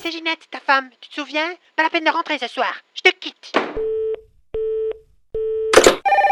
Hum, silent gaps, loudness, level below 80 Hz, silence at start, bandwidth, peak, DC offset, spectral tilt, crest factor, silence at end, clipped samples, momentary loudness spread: none; none; -19 LUFS; -46 dBFS; 0 s; 16 kHz; 0 dBFS; under 0.1%; -2 dB/octave; 20 dB; 0 s; under 0.1%; 17 LU